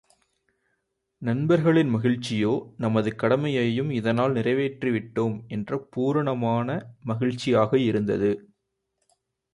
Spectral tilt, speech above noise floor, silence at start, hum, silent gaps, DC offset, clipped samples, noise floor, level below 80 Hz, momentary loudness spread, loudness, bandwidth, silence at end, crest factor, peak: -7.5 dB/octave; 54 dB; 1.2 s; none; none; under 0.1%; under 0.1%; -78 dBFS; -60 dBFS; 9 LU; -25 LUFS; 11.5 kHz; 1.15 s; 18 dB; -8 dBFS